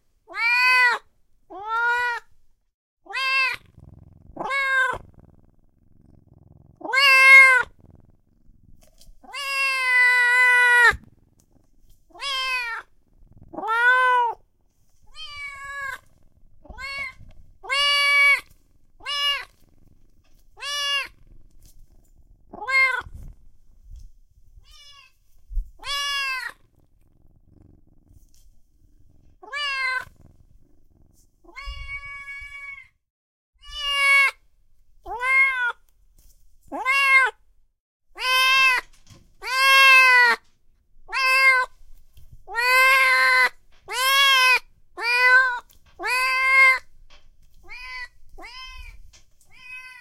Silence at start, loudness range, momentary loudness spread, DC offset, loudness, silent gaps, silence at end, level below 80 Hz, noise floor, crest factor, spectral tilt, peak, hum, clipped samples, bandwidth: 0.3 s; 15 LU; 23 LU; under 0.1%; -18 LUFS; 2.74-2.97 s, 33.10-33.53 s, 37.80-38.00 s; 0.1 s; -48 dBFS; -60 dBFS; 22 dB; 0.5 dB/octave; -2 dBFS; none; under 0.1%; 16.5 kHz